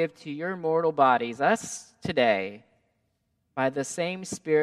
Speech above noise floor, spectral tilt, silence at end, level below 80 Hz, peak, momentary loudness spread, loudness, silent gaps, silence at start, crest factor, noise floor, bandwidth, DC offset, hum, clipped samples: 48 dB; -4.5 dB/octave; 0 s; -68 dBFS; -8 dBFS; 13 LU; -26 LUFS; none; 0 s; 20 dB; -74 dBFS; 13.5 kHz; under 0.1%; none; under 0.1%